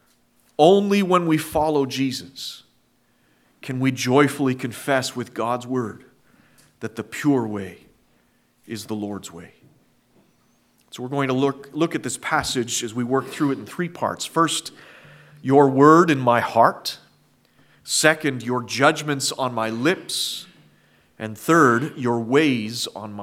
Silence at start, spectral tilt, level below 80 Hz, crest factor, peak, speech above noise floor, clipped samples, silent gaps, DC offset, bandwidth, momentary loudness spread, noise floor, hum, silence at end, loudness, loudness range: 0.6 s; -4.5 dB/octave; -60 dBFS; 22 dB; 0 dBFS; 42 dB; under 0.1%; none; under 0.1%; 16.5 kHz; 17 LU; -63 dBFS; none; 0 s; -21 LUFS; 10 LU